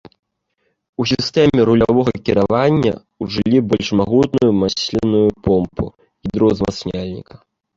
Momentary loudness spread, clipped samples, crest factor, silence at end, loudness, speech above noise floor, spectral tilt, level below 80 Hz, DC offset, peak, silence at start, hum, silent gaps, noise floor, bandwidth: 13 LU; under 0.1%; 16 dB; 0.55 s; -16 LUFS; 53 dB; -6.5 dB/octave; -40 dBFS; under 0.1%; -2 dBFS; 1 s; none; none; -68 dBFS; 7.8 kHz